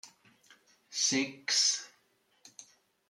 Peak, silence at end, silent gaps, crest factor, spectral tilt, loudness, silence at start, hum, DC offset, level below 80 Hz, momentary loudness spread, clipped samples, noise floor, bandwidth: -16 dBFS; 0.45 s; none; 20 dB; 0 dB/octave; -29 LUFS; 0.05 s; none; under 0.1%; -86 dBFS; 26 LU; under 0.1%; -72 dBFS; 14 kHz